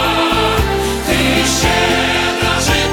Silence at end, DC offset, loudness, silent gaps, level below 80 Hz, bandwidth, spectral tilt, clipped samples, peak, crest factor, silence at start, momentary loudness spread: 0 s; under 0.1%; -13 LUFS; none; -26 dBFS; 19.5 kHz; -3.5 dB/octave; under 0.1%; -2 dBFS; 12 dB; 0 s; 3 LU